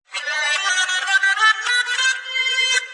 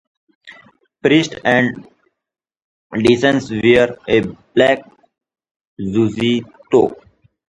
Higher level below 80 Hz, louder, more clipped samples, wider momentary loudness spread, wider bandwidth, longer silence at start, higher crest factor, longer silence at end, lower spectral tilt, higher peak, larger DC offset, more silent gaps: second, -82 dBFS vs -50 dBFS; about the same, -17 LUFS vs -16 LUFS; neither; second, 5 LU vs 8 LU; about the same, 11.5 kHz vs 11 kHz; second, 0.1 s vs 0.45 s; about the same, 16 dB vs 18 dB; second, 0 s vs 0.55 s; second, 6 dB/octave vs -6 dB/octave; second, -4 dBFS vs 0 dBFS; neither; second, none vs 2.64-2.90 s, 5.51-5.60 s, 5.67-5.77 s